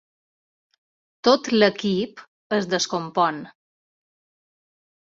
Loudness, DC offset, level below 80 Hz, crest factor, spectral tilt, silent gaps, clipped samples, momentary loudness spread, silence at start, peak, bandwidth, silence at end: -22 LUFS; under 0.1%; -68 dBFS; 22 dB; -4 dB/octave; 2.28-2.50 s; under 0.1%; 8 LU; 1.25 s; -2 dBFS; 7.8 kHz; 1.55 s